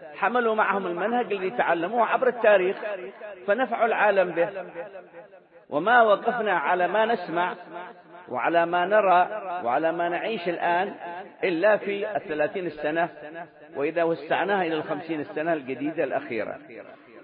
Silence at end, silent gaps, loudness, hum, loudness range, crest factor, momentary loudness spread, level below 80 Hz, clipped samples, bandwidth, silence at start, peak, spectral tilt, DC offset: 0 s; none; -24 LUFS; none; 4 LU; 20 dB; 17 LU; -74 dBFS; under 0.1%; 4.9 kHz; 0 s; -6 dBFS; -9.5 dB/octave; under 0.1%